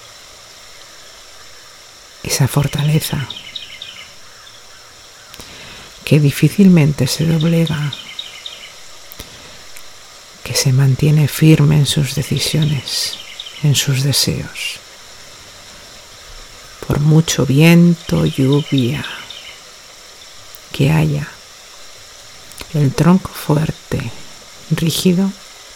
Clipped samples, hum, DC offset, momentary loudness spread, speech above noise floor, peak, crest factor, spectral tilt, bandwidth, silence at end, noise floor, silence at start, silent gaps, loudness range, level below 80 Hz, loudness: under 0.1%; none; under 0.1%; 25 LU; 26 dB; 0 dBFS; 16 dB; -5.5 dB/octave; 17 kHz; 0.15 s; -40 dBFS; 0.7 s; none; 8 LU; -42 dBFS; -15 LUFS